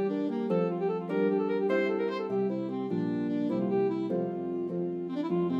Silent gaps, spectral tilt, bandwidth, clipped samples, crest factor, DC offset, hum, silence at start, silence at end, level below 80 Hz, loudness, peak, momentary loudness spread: none; -9 dB/octave; 7.2 kHz; under 0.1%; 14 dB; under 0.1%; none; 0 s; 0 s; -80 dBFS; -30 LUFS; -16 dBFS; 5 LU